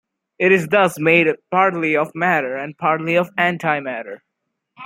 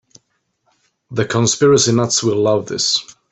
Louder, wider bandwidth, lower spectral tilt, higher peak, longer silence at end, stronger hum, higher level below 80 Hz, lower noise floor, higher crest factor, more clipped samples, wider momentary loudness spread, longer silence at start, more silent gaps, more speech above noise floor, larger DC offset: about the same, -17 LUFS vs -15 LUFS; first, 16.5 kHz vs 8.4 kHz; first, -6 dB/octave vs -4 dB/octave; about the same, -2 dBFS vs -2 dBFS; second, 0 s vs 0.2 s; neither; second, -66 dBFS vs -54 dBFS; first, -77 dBFS vs -67 dBFS; about the same, 18 dB vs 16 dB; neither; about the same, 9 LU vs 8 LU; second, 0.4 s vs 1.1 s; neither; first, 59 dB vs 52 dB; neither